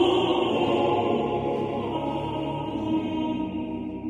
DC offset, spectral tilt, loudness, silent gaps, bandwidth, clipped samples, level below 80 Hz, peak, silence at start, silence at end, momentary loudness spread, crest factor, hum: under 0.1%; -7 dB/octave; -26 LUFS; none; 9.4 kHz; under 0.1%; -50 dBFS; -10 dBFS; 0 s; 0 s; 7 LU; 16 dB; none